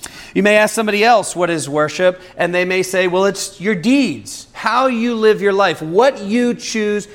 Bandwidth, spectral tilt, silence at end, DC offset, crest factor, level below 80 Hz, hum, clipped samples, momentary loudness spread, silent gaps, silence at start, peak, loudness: 16.5 kHz; -4 dB/octave; 0 s; under 0.1%; 16 dB; -54 dBFS; none; under 0.1%; 7 LU; none; 0 s; 0 dBFS; -15 LUFS